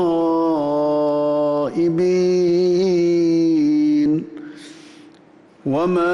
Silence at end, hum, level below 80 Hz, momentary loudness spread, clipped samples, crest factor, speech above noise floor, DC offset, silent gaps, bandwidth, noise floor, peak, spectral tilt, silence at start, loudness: 0 s; none; -60 dBFS; 7 LU; under 0.1%; 8 dB; 32 dB; under 0.1%; none; 7.2 kHz; -48 dBFS; -10 dBFS; -7.5 dB/octave; 0 s; -18 LUFS